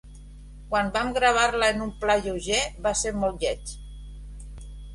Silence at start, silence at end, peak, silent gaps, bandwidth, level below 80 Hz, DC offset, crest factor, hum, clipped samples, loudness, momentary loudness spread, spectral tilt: 0.05 s; 0 s; -6 dBFS; none; 11.5 kHz; -40 dBFS; under 0.1%; 20 dB; 50 Hz at -40 dBFS; under 0.1%; -25 LUFS; 22 LU; -3 dB/octave